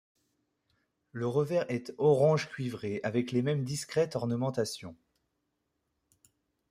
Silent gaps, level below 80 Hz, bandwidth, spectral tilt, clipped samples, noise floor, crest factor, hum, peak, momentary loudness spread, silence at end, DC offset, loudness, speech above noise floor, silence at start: none; -72 dBFS; 15.5 kHz; -6 dB/octave; under 0.1%; -81 dBFS; 20 dB; none; -14 dBFS; 11 LU; 1.75 s; under 0.1%; -31 LUFS; 51 dB; 1.15 s